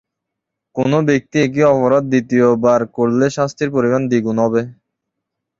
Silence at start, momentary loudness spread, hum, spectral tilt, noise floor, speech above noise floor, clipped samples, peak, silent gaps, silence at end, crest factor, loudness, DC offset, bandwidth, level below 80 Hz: 0.75 s; 6 LU; none; -7 dB/octave; -80 dBFS; 65 dB; under 0.1%; -2 dBFS; none; 0.9 s; 14 dB; -15 LUFS; under 0.1%; 7.6 kHz; -54 dBFS